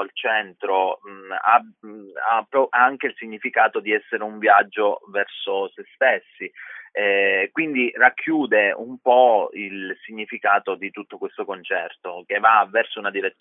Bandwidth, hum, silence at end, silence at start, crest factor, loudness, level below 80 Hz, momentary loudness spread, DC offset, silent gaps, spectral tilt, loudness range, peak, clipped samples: 3.9 kHz; none; 0.1 s; 0 s; 20 dB; -20 LUFS; -84 dBFS; 15 LU; under 0.1%; none; -8 dB/octave; 3 LU; 0 dBFS; under 0.1%